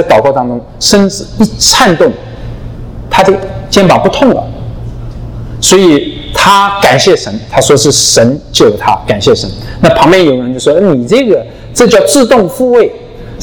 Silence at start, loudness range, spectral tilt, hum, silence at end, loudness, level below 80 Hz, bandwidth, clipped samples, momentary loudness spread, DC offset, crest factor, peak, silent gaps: 0 s; 3 LU; -4 dB/octave; none; 0 s; -7 LUFS; -28 dBFS; over 20 kHz; 4%; 18 LU; under 0.1%; 8 dB; 0 dBFS; none